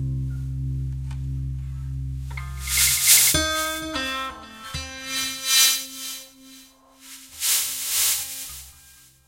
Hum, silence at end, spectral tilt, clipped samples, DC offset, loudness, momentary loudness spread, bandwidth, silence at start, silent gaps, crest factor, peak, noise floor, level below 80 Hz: none; 0.5 s; -1 dB/octave; under 0.1%; under 0.1%; -21 LUFS; 18 LU; 16.5 kHz; 0 s; none; 24 dB; -2 dBFS; -51 dBFS; -38 dBFS